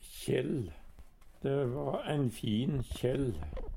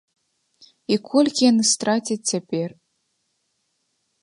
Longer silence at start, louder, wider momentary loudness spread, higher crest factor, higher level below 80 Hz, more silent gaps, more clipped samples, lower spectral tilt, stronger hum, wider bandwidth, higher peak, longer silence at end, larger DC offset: second, 0 s vs 0.9 s; second, -35 LUFS vs -20 LUFS; second, 6 LU vs 11 LU; about the same, 16 dB vs 18 dB; first, -48 dBFS vs -72 dBFS; neither; neither; first, -7 dB/octave vs -3.5 dB/octave; neither; first, 17 kHz vs 11.5 kHz; second, -18 dBFS vs -6 dBFS; second, 0 s vs 1.55 s; neither